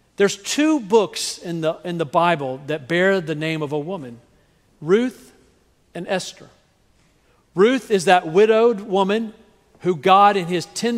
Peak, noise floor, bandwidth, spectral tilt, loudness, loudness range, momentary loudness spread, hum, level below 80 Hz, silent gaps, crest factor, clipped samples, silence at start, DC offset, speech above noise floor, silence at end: 0 dBFS; -59 dBFS; 15.5 kHz; -4.5 dB/octave; -19 LUFS; 9 LU; 14 LU; none; -64 dBFS; none; 20 dB; under 0.1%; 0.2 s; under 0.1%; 40 dB; 0 s